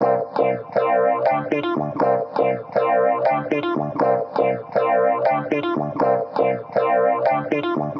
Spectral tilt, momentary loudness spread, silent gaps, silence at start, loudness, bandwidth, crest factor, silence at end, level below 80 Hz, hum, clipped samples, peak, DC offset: -8.5 dB/octave; 4 LU; none; 0 s; -20 LUFS; 6.2 kHz; 12 dB; 0 s; -64 dBFS; none; under 0.1%; -6 dBFS; under 0.1%